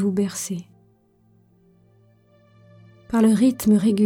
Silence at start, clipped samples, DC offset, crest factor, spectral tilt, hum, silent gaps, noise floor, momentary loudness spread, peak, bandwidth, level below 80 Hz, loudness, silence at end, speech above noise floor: 0 s; under 0.1%; under 0.1%; 16 dB; -6 dB/octave; none; none; -59 dBFS; 13 LU; -8 dBFS; 18.5 kHz; -58 dBFS; -20 LUFS; 0 s; 40 dB